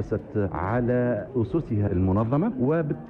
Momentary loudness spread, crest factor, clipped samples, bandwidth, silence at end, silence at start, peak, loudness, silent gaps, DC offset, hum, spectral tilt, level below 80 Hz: 4 LU; 12 dB; under 0.1%; 4.2 kHz; 0 s; 0 s; -12 dBFS; -25 LUFS; none; under 0.1%; none; -11 dB/octave; -46 dBFS